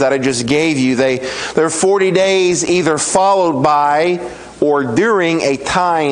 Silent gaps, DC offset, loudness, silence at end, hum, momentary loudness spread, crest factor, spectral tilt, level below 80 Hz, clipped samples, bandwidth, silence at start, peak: none; under 0.1%; -14 LUFS; 0 s; none; 4 LU; 14 dB; -4 dB/octave; -48 dBFS; under 0.1%; 11 kHz; 0 s; 0 dBFS